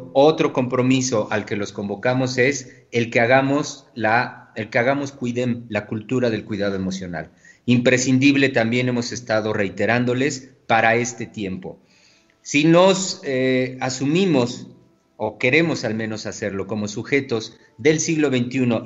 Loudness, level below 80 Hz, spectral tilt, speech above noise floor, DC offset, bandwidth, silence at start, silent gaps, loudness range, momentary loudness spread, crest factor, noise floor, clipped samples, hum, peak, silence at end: -20 LUFS; -62 dBFS; -5 dB/octave; 36 dB; under 0.1%; 8.2 kHz; 0 s; none; 4 LU; 13 LU; 20 dB; -56 dBFS; under 0.1%; none; -2 dBFS; 0 s